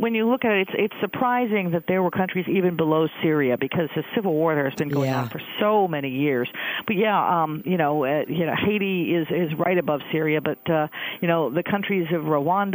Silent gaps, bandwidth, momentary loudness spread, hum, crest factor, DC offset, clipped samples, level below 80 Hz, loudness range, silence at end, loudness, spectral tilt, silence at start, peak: none; 16 kHz; 4 LU; none; 16 dB; under 0.1%; under 0.1%; -64 dBFS; 1 LU; 0 s; -23 LUFS; -7.5 dB/octave; 0 s; -6 dBFS